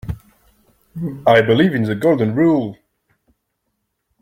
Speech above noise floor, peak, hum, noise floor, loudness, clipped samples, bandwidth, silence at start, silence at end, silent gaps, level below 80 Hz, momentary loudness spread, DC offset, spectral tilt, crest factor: 58 dB; -2 dBFS; none; -73 dBFS; -16 LUFS; under 0.1%; 16 kHz; 0.05 s; 1.45 s; none; -46 dBFS; 18 LU; under 0.1%; -8 dB/octave; 18 dB